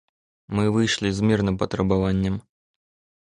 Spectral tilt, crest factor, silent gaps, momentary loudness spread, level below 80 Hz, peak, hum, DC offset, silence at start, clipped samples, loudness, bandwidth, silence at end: -6 dB/octave; 16 dB; none; 6 LU; -42 dBFS; -6 dBFS; none; under 0.1%; 0.5 s; under 0.1%; -23 LUFS; 11 kHz; 0.85 s